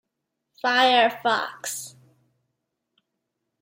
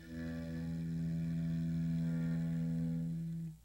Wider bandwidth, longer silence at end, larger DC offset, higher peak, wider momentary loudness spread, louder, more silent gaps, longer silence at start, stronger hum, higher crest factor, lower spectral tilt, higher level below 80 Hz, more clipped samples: first, 16.5 kHz vs 8.2 kHz; first, 1.75 s vs 0.05 s; neither; first, -6 dBFS vs -28 dBFS; first, 15 LU vs 6 LU; first, -22 LUFS vs -39 LUFS; neither; first, 0.65 s vs 0 s; neither; first, 20 dB vs 8 dB; second, -1 dB/octave vs -9 dB/octave; second, -82 dBFS vs -56 dBFS; neither